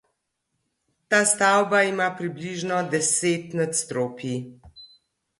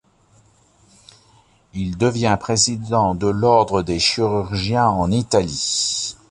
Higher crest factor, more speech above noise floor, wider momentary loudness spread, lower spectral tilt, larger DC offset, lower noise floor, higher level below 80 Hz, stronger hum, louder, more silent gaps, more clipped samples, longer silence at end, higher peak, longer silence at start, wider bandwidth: about the same, 18 dB vs 18 dB; first, 54 dB vs 37 dB; first, 13 LU vs 6 LU; about the same, -3 dB/octave vs -4 dB/octave; neither; first, -77 dBFS vs -55 dBFS; second, -66 dBFS vs -42 dBFS; neither; second, -23 LUFS vs -18 LUFS; neither; neither; first, 0.55 s vs 0.2 s; second, -6 dBFS vs -2 dBFS; second, 1.1 s vs 1.75 s; about the same, 11.5 kHz vs 11.5 kHz